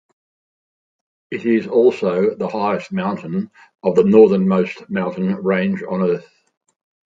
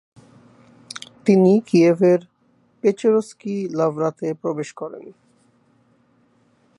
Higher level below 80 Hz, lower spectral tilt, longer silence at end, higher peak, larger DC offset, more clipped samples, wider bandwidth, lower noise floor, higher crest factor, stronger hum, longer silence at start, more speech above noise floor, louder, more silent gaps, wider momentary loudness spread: first, -62 dBFS vs -72 dBFS; about the same, -8.5 dB/octave vs -7.5 dB/octave; second, 0.9 s vs 1.7 s; first, 0 dBFS vs -4 dBFS; neither; neither; second, 7.6 kHz vs 11.5 kHz; first, under -90 dBFS vs -60 dBFS; about the same, 18 dB vs 18 dB; neither; first, 1.3 s vs 0.95 s; first, over 73 dB vs 42 dB; about the same, -18 LUFS vs -19 LUFS; neither; second, 12 LU vs 19 LU